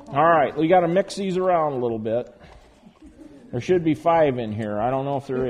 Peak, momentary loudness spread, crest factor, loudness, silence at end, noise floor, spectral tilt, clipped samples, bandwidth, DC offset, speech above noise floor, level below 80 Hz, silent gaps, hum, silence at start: -4 dBFS; 10 LU; 18 dB; -21 LUFS; 0 s; -49 dBFS; -7 dB/octave; under 0.1%; 11 kHz; under 0.1%; 28 dB; -54 dBFS; none; none; 0 s